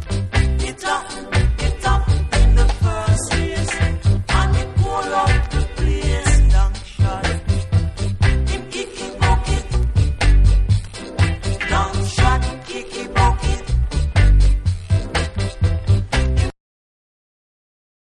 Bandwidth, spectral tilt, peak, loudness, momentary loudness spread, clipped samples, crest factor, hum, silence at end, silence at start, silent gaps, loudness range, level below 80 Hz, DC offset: 11 kHz; -5 dB/octave; 0 dBFS; -19 LUFS; 7 LU; under 0.1%; 16 dB; none; 1.6 s; 0 s; none; 2 LU; -20 dBFS; under 0.1%